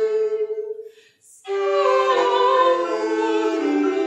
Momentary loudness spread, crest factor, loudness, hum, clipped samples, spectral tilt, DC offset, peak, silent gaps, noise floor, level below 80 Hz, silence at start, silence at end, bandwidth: 12 LU; 14 dB; -20 LUFS; none; under 0.1%; -2.5 dB/octave; under 0.1%; -6 dBFS; none; -51 dBFS; under -90 dBFS; 0 s; 0 s; 11 kHz